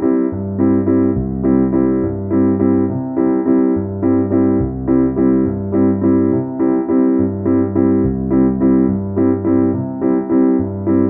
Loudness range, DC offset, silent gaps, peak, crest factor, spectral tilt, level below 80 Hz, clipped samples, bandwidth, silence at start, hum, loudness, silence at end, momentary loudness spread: 1 LU; under 0.1%; none; -2 dBFS; 12 dB; -16 dB/octave; -36 dBFS; under 0.1%; 2.5 kHz; 0 s; none; -15 LUFS; 0 s; 4 LU